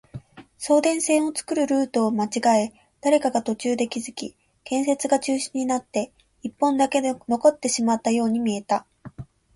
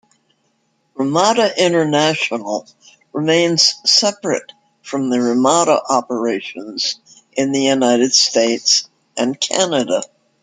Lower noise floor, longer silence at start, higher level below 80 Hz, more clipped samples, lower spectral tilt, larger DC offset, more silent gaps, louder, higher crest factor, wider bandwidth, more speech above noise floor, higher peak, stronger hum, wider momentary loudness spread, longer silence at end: second, -42 dBFS vs -64 dBFS; second, 0.15 s vs 1 s; about the same, -62 dBFS vs -66 dBFS; neither; about the same, -4 dB/octave vs -3 dB/octave; neither; neither; second, -23 LUFS vs -16 LUFS; about the same, 18 dB vs 18 dB; about the same, 11.5 kHz vs 11 kHz; second, 20 dB vs 48 dB; second, -6 dBFS vs 0 dBFS; neither; about the same, 15 LU vs 13 LU; about the same, 0.3 s vs 0.35 s